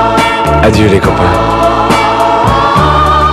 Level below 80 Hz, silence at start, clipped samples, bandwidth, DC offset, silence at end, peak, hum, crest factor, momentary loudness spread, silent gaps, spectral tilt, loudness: -20 dBFS; 0 s; 1%; 15.5 kHz; under 0.1%; 0 s; 0 dBFS; none; 8 dB; 2 LU; none; -6 dB/octave; -8 LUFS